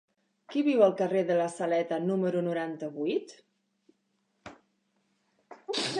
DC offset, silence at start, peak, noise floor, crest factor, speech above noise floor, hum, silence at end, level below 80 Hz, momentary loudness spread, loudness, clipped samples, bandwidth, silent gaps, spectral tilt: under 0.1%; 0.5 s; -10 dBFS; -76 dBFS; 22 dB; 48 dB; none; 0 s; -80 dBFS; 11 LU; -29 LUFS; under 0.1%; 11 kHz; none; -5.5 dB/octave